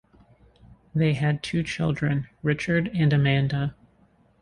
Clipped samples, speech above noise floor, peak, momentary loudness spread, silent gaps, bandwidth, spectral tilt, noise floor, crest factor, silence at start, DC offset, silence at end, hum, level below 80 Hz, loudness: under 0.1%; 37 dB; -8 dBFS; 6 LU; none; 10 kHz; -7 dB/octave; -61 dBFS; 16 dB; 0.95 s; under 0.1%; 0.7 s; none; -52 dBFS; -25 LUFS